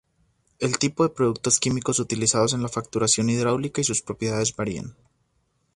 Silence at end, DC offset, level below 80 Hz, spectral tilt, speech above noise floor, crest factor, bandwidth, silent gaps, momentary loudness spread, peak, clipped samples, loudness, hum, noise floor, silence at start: 0.85 s; under 0.1%; -56 dBFS; -4 dB/octave; 46 dB; 20 dB; 11.5 kHz; none; 8 LU; -4 dBFS; under 0.1%; -23 LUFS; none; -70 dBFS; 0.6 s